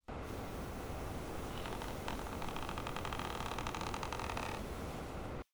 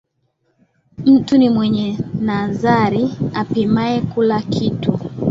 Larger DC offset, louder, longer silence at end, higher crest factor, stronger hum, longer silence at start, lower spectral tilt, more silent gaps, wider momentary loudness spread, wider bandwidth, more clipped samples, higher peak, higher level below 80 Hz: neither; second, -43 LUFS vs -17 LUFS; about the same, 0.1 s vs 0 s; about the same, 18 dB vs 14 dB; neither; second, 0.05 s vs 1 s; second, -4.5 dB/octave vs -8 dB/octave; neither; second, 4 LU vs 8 LU; first, over 20 kHz vs 7.6 kHz; neither; second, -24 dBFS vs -2 dBFS; about the same, -50 dBFS vs -48 dBFS